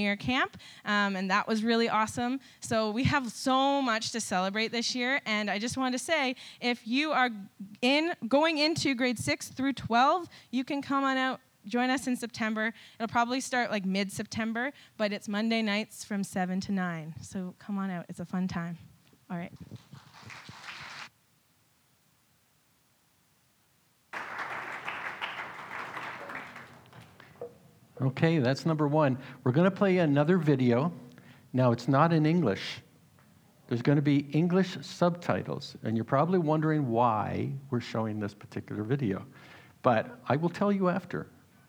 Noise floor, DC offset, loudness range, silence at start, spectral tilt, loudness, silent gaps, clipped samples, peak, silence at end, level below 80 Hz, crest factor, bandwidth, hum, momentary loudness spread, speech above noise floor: -68 dBFS; under 0.1%; 13 LU; 0 s; -5.5 dB/octave; -29 LUFS; none; under 0.1%; -8 dBFS; 0.45 s; -66 dBFS; 22 dB; 18.5 kHz; none; 15 LU; 39 dB